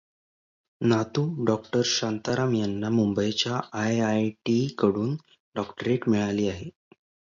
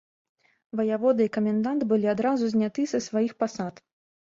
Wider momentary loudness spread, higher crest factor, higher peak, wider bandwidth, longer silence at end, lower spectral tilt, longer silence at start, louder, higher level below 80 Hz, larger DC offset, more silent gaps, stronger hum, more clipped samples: about the same, 7 LU vs 6 LU; about the same, 20 dB vs 16 dB; first, -8 dBFS vs -12 dBFS; about the same, 7.6 kHz vs 7.6 kHz; about the same, 0.65 s vs 0.6 s; about the same, -5.5 dB/octave vs -6.5 dB/octave; about the same, 0.8 s vs 0.75 s; about the same, -26 LUFS vs -26 LUFS; first, -58 dBFS vs -68 dBFS; neither; first, 5.40-5.52 s vs none; neither; neither